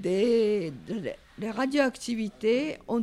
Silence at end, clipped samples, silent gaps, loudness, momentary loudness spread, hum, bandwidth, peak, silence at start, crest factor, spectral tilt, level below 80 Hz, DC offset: 0 s; under 0.1%; none; -28 LUFS; 11 LU; none; 13 kHz; -12 dBFS; 0 s; 14 dB; -5.5 dB/octave; -60 dBFS; under 0.1%